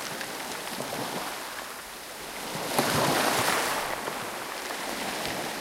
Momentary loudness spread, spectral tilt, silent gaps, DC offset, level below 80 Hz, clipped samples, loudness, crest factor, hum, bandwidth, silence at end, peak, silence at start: 13 LU; -2.5 dB/octave; none; under 0.1%; -60 dBFS; under 0.1%; -30 LUFS; 22 dB; none; 16.5 kHz; 0 s; -8 dBFS; 0 s